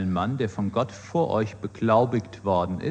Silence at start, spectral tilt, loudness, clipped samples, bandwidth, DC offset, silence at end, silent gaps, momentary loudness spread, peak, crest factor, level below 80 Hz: 0 s; -7.5 dB/octave; -25 LUFS; under 0.1%; 9.2 kHz; under 0.1%; 0 s; none; 7 LU; -6 dBFS; 18 dB; -56 dBFS